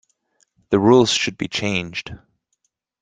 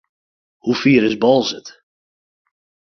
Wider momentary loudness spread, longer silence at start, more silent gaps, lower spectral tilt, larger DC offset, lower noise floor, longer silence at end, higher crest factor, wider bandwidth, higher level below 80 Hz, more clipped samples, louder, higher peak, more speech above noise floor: first, 16 LU vs 13 LU; about the same, 0.7 s vs 0.65 s; neither; about the same, -4.5 dB/octave vs -5.5 dB/octave; neither; second, -72 dBFS vs under -90 dBFS; second, 0.85 s vs 1.2 s; about the same, 20 dB vs 18 dB; first, 9.4 kHz vs 6.8 kHz; about the same, -54 dBFS vs -58 dBFS; neither; about the same, -18 LUFS vs -16 LUFS; about the same, -2 dBFS vs -2 dBFS; second, 54 dB vs over 75 dB